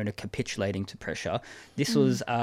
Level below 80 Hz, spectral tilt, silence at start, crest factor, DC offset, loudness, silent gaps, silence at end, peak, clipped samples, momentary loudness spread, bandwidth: -56 dBFS; -5.5 dB/octave; 0 s; 18 dB; under 0.1%; -30 LUFS; none; 0 s; -12 dBFS; under 0.1%; 10 LU; 16 kHz